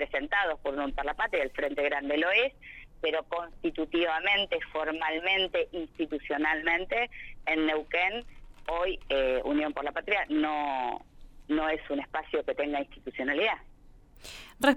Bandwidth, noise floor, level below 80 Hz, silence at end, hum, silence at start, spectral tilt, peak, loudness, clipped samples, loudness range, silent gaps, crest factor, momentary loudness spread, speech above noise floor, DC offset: 16 kHz; -54 dBFS; -50 dBFS; 0 s; none; 0 s; -4 dB/octave; -8 dBFS; -30 LUFS; under 0.1%; 3 LU; none; 22 dB; 9 LU; 24 dB; under 0.1%